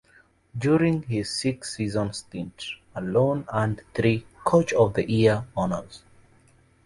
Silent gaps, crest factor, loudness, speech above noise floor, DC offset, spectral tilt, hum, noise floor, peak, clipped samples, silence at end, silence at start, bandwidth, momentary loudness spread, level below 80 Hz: none; 20 dB; -25 LUFS; 35 dB; under 0.1%; -6 dB/octave; none; -59 dBFS; -6 dBFS; under 0.1%; 0.85 s; 0.55 s; 11.5 kHz; 13 LU; -52 dBFS